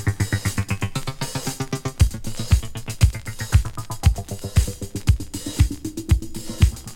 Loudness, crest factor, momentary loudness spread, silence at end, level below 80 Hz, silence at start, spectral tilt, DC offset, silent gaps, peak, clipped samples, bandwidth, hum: -24 LUFS; 18 dB; 8 LU; 0 s; -26 dBFS; 0 s; -5 dB/octave; under 0.1%; none; -2 dBFS; under 0.1%; 17 kHz; none